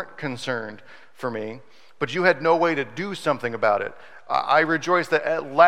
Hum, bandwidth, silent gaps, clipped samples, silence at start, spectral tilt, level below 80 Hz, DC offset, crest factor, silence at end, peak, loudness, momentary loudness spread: none; 13.5 kHz; none; under 0.1%; 0 s; -5 dB/octave; -74 dBFS; 0.5%; 20 dB; 0 s; -2 dBFS; -23 LUFS; 13 LU